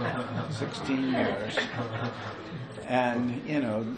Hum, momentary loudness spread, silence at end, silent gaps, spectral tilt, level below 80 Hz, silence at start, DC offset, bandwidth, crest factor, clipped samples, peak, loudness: none; 11 LU; 0 s; none; -6 dB/octave; -60 dBFS; 0 s; under 0.1%; 10 kHz; 18 dB; under 0.1%; -12 dBFS; -31 LUFS